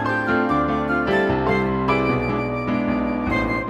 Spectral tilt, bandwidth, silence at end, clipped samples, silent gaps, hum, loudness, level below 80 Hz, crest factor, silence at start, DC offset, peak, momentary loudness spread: -7.5 dB/octave; 9.4 kHz; 0 s; under 0.1%; none; none; -21 LUFS; -38 dBFS; 14 dB; 0 s; under 0.1%; -6 dBFS; 3 LU